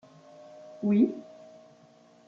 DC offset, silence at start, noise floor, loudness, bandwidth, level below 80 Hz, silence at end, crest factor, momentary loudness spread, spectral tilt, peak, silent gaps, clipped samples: under 0.1%; 0.65 s; -58 dBFS; -27 LUFS; 6.8 kHz; -78 dBFS; 1.05 s; 20 dB; 26 LU; -9.5 dB/octave; -12 dBFS; none; under 0.1%